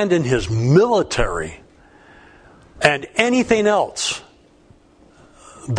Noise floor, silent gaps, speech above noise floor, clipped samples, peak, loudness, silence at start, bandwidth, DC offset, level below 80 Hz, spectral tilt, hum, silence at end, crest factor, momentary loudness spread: -51 dBFS; none; 34 dB; under 0.1%; 0 dBFS; -18 LUFS; 0 s; 10.5 kHz; under 0.1%; -38 dBFS; -5 dB/octave; none; 0 s; 20 dB; 12 LU